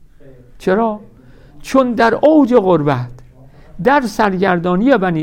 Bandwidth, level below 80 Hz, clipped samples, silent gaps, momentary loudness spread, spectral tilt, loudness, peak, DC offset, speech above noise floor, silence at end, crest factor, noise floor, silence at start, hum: 16 kHz; -42 dBFS; under 0.1%; none; 11 LU; -7 dB/octave; -14 LUFS; -2 dBFS; under 0.1%; 28 dB; 0 s; 14 dB; -41 dBFS; 0.3 s; none